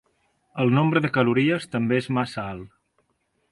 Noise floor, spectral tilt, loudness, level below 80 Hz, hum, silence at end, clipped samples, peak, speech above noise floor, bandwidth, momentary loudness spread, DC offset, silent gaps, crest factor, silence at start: -71 dBFS; -7.5 dB/octave; -23 LUFS; -60 dBFS; none; 0.85 s; under 0.1%; -8 dBFS; 49 dB; 11.5 kHz; 14 LU; under 0.1%; none; 16 dB; 0.55 s